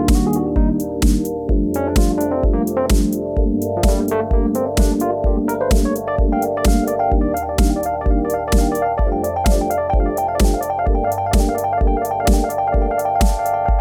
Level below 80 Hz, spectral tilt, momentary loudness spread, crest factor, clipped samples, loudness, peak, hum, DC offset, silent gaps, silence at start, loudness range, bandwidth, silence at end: -20 dBFS; -6.5 dB/octave; 2 LU; 14 dB; under 0.1%; -18 LUFS; -2 dBFS; none; under 0.1%; none; 0 s; 0 LU; 19 kHz; 0 s